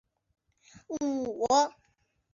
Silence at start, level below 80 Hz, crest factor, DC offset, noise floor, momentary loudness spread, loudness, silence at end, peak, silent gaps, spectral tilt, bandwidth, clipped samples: 0.9 s; -68 dBFS; 20 dB; under 0.1%; -73 dBFS; 9 LU; -29 LUFS; 0.65 s; -12 dBFS; none; -3 dB/octave; 7.6 kHz; under 0.1%